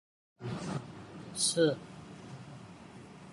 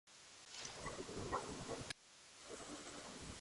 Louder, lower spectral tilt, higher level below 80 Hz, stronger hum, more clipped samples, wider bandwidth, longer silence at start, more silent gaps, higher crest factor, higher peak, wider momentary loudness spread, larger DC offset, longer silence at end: first, -33 LUFS vs -49 LUFS; about the same, -3.5 dB/octave vs -3 dB/octave; about the same, -68 dBFS vs -66 dBFS; neither; neither; about the same, 11.5 kHz vs 11.5 kHz; first, 0.4 s vs 0.05 s; neither; about the same, 20 dB vs 22 dB; first, -16 dBFS vs -28 dBFS; first, 22 LU vs 13 LU; neither; about the same, 0 s vs 0 s